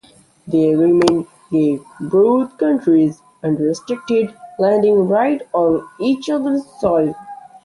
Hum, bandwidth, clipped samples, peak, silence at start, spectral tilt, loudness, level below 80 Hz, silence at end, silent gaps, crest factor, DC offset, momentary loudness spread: none; 11.5 kHz; under 0.1%; 0 dBFS; 0.45 s; -7 dB/octave; -17 LUFS; -56 dBFS; 0.3 s; none; 16 dB; under 0.1%; 8 LU